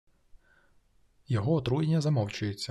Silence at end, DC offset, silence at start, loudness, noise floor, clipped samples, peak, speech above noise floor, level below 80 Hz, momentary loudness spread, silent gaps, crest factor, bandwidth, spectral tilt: 0 s; under 0.1%; 0.35 s; -29 LUFS; -66 dBFS; under 0.1%; -16 dBFS; 38 dB; -58 dBFS; 6 LU; none; 16 dB; 12 kHz; -7 dB/octave